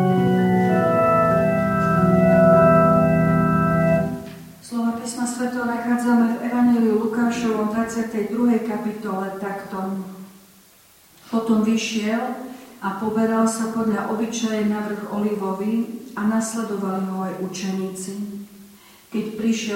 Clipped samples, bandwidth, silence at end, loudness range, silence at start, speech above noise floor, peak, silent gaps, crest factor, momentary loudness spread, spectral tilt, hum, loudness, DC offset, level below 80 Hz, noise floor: under 0.1%; 16.5 kHz; 0 s; 10 LU; 0 s; 29 dB; -4 dBFS; none; 18 dB; 13 LU; -6.5 dB/octave; none; -21 LUFS; under 0.1%; -50 dBFS; -52 dBFS